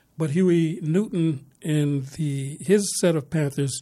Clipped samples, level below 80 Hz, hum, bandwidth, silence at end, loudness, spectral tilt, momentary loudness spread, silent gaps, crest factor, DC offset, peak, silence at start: under 0.1%; -62 dBFS; none; 14.5 kHz; 0 s; -24 LUFS; -6 dB/octave; 8 LU; none; 16 dB; under 0.1%; -8 dBFS; 0.2 s